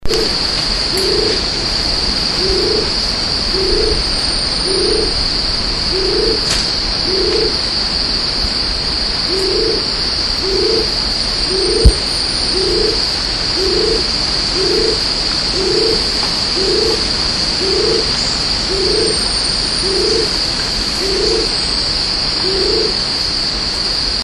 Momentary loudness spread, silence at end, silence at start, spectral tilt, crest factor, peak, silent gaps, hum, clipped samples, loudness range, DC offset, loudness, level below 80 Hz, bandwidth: 2 LU; 0 s; 0 s; -3 dB/octave; 16 dB; 0 dBFS; none; none; under 0.1%; 1 LU; under 0.1%; -13 LUFS; -26 dBFS; 13 kHz